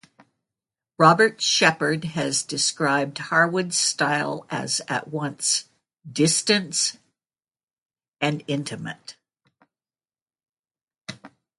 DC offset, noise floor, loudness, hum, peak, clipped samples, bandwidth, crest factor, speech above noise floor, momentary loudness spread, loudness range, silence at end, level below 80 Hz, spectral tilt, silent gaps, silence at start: under 0.1%; under -90 dBFS; -22 LUFS; none; -2 dBFS; under 0.1%; 11.5 kHz; 22 dB; over 67 dB; 15 LU; 12 LU; 0.3 s; -70 dBFS; -3 dB/octave; 7.64-7.86 s, 8.08-8.12 s, 10.22-10.26 s, 10.59-10.63 s, 10.83-10.87 s; 1 s